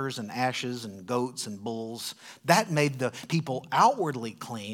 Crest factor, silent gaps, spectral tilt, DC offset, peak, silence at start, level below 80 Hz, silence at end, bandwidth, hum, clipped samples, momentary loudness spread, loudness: 24 dB; none; -4.5 dB/octave; under 0.1%; -4 dBFS; 0 s; -78 dBFS; 0 s; 19 kHz; none; under 0.1%; 14 LU; -29 LUFS